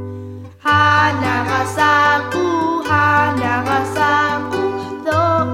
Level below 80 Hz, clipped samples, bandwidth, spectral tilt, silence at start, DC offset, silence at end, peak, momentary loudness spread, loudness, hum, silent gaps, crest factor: -50 dBFS; under 0.1%; 16 kHz; -5 dB/octave; 0 s; under 0.1%; 0 s; -2 dBFS; 9 LU; -15 LUFS; none; none; 14 dB